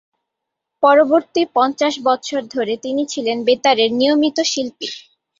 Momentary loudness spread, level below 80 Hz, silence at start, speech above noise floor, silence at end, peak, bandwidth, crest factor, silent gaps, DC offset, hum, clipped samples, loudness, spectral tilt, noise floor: 10 LU; -66 dBFS; 0.8 s; 63 dB; 0.4 s; -2 dBFS; 7.8 kHz; 16 dB; none; under 0.1%; none; under 0.1%; -17 LUFS; -2.5 dB/octave; -80 dBFS